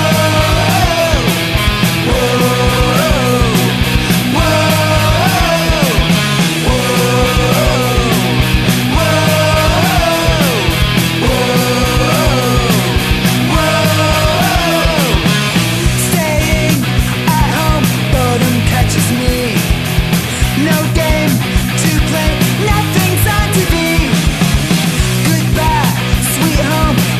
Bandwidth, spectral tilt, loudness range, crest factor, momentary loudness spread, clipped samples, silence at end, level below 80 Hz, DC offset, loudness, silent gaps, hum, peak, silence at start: 14.5 kHz; -4.5 dB/octave; 1 LU; 12 dB; 2 LU; under 0.1%; 0 s; -20 dBFS; under 0.1%; -12 LUFS; none; none; 0 dBFS; 0 s